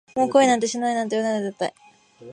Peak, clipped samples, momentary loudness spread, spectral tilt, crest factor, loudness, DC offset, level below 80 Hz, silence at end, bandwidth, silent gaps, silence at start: -4 dBFS; under 0.1%; 11 LU; -3.5 dB/octave; 18 dB; -22 LUFS; under 0.1%; -70 dBFS; 0 s; 11 kHz; none; 0.15 s